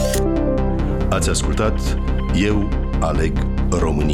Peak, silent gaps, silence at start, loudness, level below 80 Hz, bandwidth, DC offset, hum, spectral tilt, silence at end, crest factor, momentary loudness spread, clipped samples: -8 dBFS; none; 0 s; -20 LUFS; -20 dBFS; 16 kHz; under 0.1%; none; -6 dB/octave; 0 s; 10 dB; 3 LU; under 0.1%